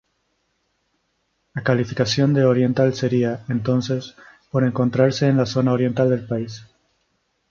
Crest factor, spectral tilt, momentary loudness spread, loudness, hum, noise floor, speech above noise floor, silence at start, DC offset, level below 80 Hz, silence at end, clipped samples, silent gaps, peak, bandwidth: 18 dB; -7 dB/octave; 10 LU; -20 LUFS; none; -70 dBFS; 51 dB; 1.55 s; under 0.1%; -56 dBFS; 0.85 s; under 0.1%; none; -4 dBFS; 7.4 kHz